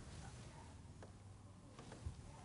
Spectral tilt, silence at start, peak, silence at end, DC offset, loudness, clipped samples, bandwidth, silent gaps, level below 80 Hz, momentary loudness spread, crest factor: -5 dB/octave; 0 s; -36 dBFS; 0 s; under 0.1%; -57 LUFS; under 0.1%; 10.5 kHz; none; -60 dBFS; 6 LU; 18 dB